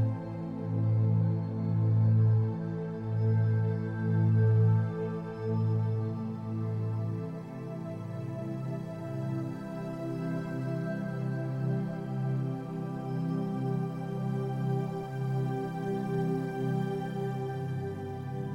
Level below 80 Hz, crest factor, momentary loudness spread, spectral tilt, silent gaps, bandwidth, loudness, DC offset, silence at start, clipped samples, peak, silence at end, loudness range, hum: -64 dBFS; 14 dB; 11 LU; -10 dB/octave; none; 5.8 kHz; -32 LUFS; under 0.1%; 0 s; under 0.1%; -16 dBFS; 0 s; 8 LU; none